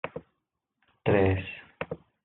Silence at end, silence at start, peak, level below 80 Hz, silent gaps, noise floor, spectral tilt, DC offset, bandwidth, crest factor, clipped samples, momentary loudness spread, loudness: 0.3 s; 0.05 s; -8 dBFS; -62 dBFS; none; -82 dBFS; -6.5 dB/octave; under 0.1%; 4.1 kHz; 22 dB; under 0.1%; 16 LU; -28 LUFS